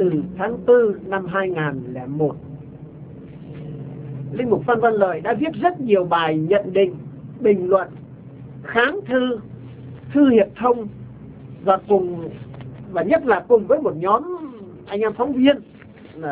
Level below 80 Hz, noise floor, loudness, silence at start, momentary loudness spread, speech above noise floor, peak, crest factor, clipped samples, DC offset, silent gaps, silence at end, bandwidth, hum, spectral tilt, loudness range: -54 dBFS; -42 dBFS; -20 LUFS; 0 s; 21 LU; 23 dB; 0 dBFS; 20 dB; under 0.1%; under 0.1%; none; 0 s; 4 kHz; none; -10.5 dB/octave; 4 LU